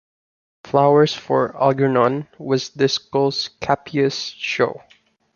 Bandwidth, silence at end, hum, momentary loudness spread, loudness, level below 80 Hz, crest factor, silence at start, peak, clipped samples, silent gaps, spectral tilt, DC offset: 7.2 kHz; 0.6 s; none; 8 LU; -19 LUFS; -58 dBFS; 18 dB; 0.65 s; 0 dBFS; under 0.1%; none; -5.5 dB/octave; under 0.1%